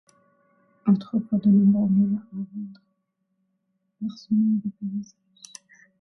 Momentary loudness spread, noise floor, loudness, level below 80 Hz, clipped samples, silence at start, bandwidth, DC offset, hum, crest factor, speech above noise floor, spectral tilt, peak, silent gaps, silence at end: 23 LU; -75 dBFS; -23 LUFS; -66 dBFS; under 0.1%; 0.85 s; 6.6 kHz; under 0.1%; none; 16 dB; 52 dB; -9 dB/octave; -10 dBFS; none; 0.95 s